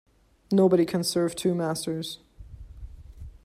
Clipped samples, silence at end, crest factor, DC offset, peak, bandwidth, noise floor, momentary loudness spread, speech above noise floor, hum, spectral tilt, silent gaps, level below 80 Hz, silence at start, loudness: under 0.1%; 0.05 s; 18 dB; under 0.1%; -10 dBFS; 15 kHz; -45 dBFS; 25 LU; 21 dB; none; -5.5 dB/octave; none; -50 dBFS; 0.5 s; -25 LUFS